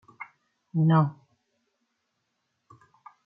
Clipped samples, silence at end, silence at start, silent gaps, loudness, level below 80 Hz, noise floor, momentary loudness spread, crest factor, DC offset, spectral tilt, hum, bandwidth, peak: under 0.1%; 2.15 s; 0.2 s; none; -25 LUFS; -76 dBFS; -78 dBFS; 23 LU; 22 dB; under 0.1%; -11 dB/octave; none; 4.9 kHz; -8 dBFS